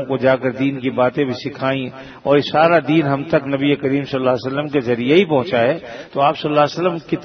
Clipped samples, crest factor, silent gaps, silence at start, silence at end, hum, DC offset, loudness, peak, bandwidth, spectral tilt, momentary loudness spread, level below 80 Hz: under 0.1%; 16 dB; none; 0 s; 0 s; none; under 0.1%; -17 LUFS; 0 dBFS; 6.6 kHz; -7.5 dB/octave; 7 LU; -56 dBFS